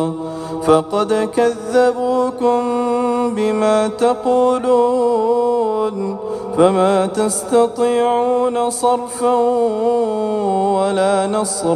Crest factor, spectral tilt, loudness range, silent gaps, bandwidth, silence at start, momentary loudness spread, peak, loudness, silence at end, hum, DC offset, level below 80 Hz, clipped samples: 16 dB; -5 dB/octave; 1 LU; none; 13.5 kHz; 0 s; 4 LU; 0 dBFS; -16 LUFS; 0 s; none; under 0.1%; -54 dBFS; under 0.1%